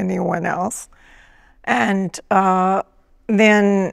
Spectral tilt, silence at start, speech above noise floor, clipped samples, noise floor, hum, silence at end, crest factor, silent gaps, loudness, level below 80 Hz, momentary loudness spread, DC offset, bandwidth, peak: -5.5 dB/octave; 0 s; 31 dB; under 0.1%; -49 dBFS; none; 0 s; 16 dB; none; -18 LUFS; -54 dBFS; 18 LU; under 0.1%; 14 kHz; -2 dBFS